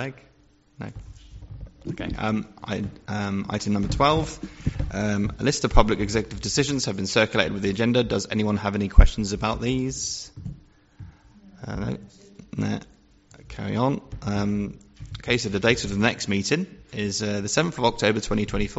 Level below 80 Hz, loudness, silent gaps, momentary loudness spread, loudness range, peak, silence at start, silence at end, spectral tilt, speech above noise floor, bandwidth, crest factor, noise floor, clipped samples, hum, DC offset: -30 dBFS; -25 LUFS; none; 16 LU; 9 LU; 0 dBFS; 0 s; 0 s; -4.5 dB/octave; 29 dB; 8 kHz; 24 dB; -53 dBFS; under 0.1%; none; under 0.1%